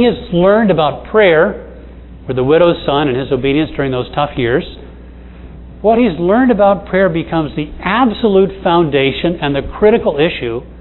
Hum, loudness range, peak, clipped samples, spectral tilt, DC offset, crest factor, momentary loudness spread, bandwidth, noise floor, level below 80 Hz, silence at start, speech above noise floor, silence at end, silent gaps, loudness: none; 3 LU; 0 dBFS; under 0.1%; -10 dB/octave; under 0.1%; 14 dB; 8 LU; 4.2 kHz; -33 dBFS; -34 dBFS; 0 s; 21 dB; 0 s; none; -13 LUFS